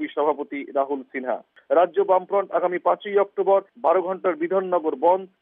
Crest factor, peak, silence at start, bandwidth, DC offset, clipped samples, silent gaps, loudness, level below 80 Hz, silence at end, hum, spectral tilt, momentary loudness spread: 16 dB; -6 dBFS; 0 s; 3.8 kHz; under 0.1%; under 0.1%; none; -23 LUFS; -84 dBFS; 0.15 s; none; -9.5 dB/octave; 8 LU